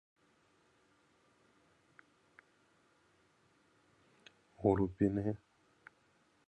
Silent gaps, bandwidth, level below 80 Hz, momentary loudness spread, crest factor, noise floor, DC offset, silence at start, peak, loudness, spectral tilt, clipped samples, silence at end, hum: none; 9 kHz; -62 dBFS; 9 LU; 26 dB; -72 dBFS; under 0.1%; 4.6 s; -16 dBFS; -35 LUFS; -9.5 dB/octave; under 0.1%; 1.1 s; none